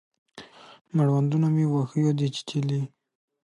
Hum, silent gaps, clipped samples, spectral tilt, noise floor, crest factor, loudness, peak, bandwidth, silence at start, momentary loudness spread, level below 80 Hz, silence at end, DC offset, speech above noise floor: none; 0.81-0.85 s; under 0.1%; -8 dB/octave; -48 dBFS; 12 dB; -25 LUFS; -12 dBFS; 10.5 kHz; 0.35 s; 8 LU; -72 dBFS; 0.55 s; under 0.1%; 24 dB